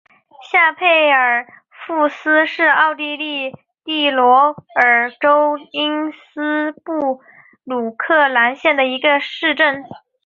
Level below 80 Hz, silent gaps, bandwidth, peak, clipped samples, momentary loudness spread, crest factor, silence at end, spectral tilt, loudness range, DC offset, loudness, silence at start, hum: -68 dBFS; none; 7.2 kHz; -2 dBFS; under 0.1%; 12 LU; 16 dB; 0.3 s; -4.5 dB/octave; 4 LU; under 0.1%; -15 LUFS; 0.4 s; none